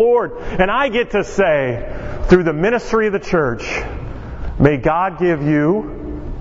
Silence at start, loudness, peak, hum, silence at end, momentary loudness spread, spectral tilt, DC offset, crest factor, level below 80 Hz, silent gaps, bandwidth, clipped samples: 0 s; -17 LUFS; 0 dBFS; none; 0 s; 14 LU; -7 dB/octave; under 0.1%; 16 dB; -30 dBFS; none; 8 kHz; under 0.1%